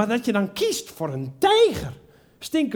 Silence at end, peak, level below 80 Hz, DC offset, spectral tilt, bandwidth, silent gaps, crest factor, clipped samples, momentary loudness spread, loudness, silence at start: 0 s; -6 dBFS; -52 dBFS; under 0.1%; -4.5 dB/octave; 19.5 kHz; none; 16 dB; under 0.1%; 15 LU; -22 LUFS; 0 s